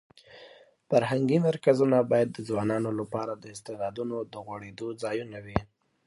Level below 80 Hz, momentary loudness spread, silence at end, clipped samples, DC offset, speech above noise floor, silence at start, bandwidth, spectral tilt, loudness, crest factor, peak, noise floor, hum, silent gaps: -54 dBFS; 15 LU; 0.45 s; under 0.1%; under 0.1%; 26 dB; 0.35 s; 11.5 kHz; -7 dB/octave; -28 LUFS; 22 dB; -6 dBFS; -54 dBFS; none; none